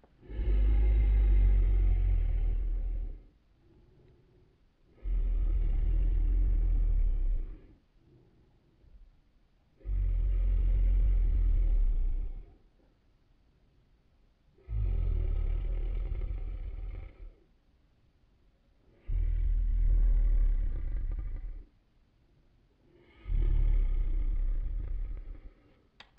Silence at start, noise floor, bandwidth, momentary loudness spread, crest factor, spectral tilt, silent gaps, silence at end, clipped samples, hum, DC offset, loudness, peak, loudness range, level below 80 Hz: 0.3 s; -66 dBFS; 2.9 kHz; 17 LU; 12 dB; -10.5 dB/octave; none; 0.7 s; under 0.1%; none; under 0.1%; -33 LUFS; -16 dBFS; 8 LU; -30 dBFS